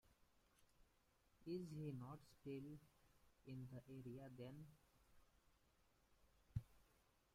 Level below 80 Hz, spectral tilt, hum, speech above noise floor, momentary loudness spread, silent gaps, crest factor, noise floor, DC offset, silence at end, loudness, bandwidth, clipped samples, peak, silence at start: -74 dBFS; -8 dB/octave; none; 25 dB; 10 LU; none; 24 dB; -80 dBFS; under 0.1%; 0.4 s; -56 LUFS; 16 kHz; under 0.1%; -34 dBFS; 0.05 s